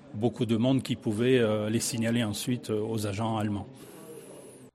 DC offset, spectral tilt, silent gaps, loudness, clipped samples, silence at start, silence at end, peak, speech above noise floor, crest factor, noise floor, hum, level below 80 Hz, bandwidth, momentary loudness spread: under 0.1%; -5.5 dB/octave; none; -28 LUFS; under 0.1%; 0.05 s; 0.05 s; -10 dBFS; 20 dB; 18 dB; -48 dBFS; none; -64 dBFS; 14.5 kHz; 21 LU